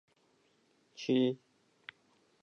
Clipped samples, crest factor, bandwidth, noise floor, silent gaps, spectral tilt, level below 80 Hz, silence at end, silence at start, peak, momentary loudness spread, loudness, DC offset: under 0.1%; 20 dB; 6.8 kHz; -72 dBFS; none; -6.5 dB/octave; under -90 dBFS; 1.05 s; 1 s; -18 dBFS; 22 LU; -33 LUFS; under 0.1%